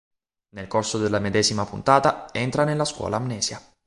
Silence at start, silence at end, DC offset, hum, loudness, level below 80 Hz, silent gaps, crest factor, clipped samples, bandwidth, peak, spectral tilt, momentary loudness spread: 0.55 s; 0.25 s; under 0.1%; none; -23 LUFS; -52 dBFS; none; 22 dB; under 0.1%; 11.5 kHz; -2 dBFS; -4 dB/octave; 8 LU